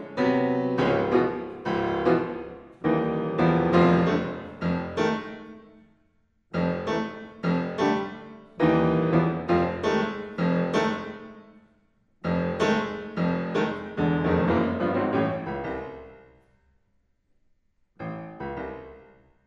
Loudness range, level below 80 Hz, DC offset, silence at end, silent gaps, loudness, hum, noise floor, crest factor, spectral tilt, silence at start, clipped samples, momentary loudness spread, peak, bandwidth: 7 LU; -52 dBFS; under 0.1%; 0.45 s; none; -26 LUFS; none; -68 dBFS; 20 dB; -7.5 dB/octave; 0 s; under 0.1%; 15 LU; -6 dBFS; 7.6 kHz